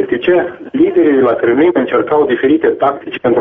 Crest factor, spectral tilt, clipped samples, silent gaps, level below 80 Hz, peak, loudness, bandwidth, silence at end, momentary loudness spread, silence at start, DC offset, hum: 10 dB; -4.5 dB/octave; under 0.1%; none; -50 dBFS; 0 dBFS; -12 LUFS; 3.8 kHz; 0 s; 5 LU; 0 s; under 0.1%; none